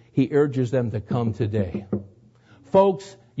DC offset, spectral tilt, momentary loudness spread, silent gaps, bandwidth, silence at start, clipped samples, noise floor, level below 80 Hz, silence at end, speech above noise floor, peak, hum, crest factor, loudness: under 0.1%; -8.5 dB/octave; 13 LU; none; 8 kHz; 0.15 s; under 0.1%; -53 dBFS; -56 dBFS; 0.25 s; 31 dB; -6 dBFS; none; 18 dB; -23 LUFS